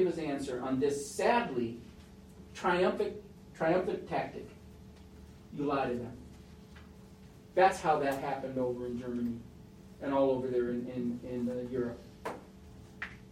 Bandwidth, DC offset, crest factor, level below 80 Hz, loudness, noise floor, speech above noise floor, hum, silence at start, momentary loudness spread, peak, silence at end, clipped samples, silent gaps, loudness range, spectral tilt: 16 kHz; under 0.1%; 22 dB; -60 dBFS; -33 LUFS; -54 dBFS; 21 dB; none; 0 s; 24 LU; -12 dBFS; 0.05 s; under 0.1%; none; 4 LU; -5.5 dB/octave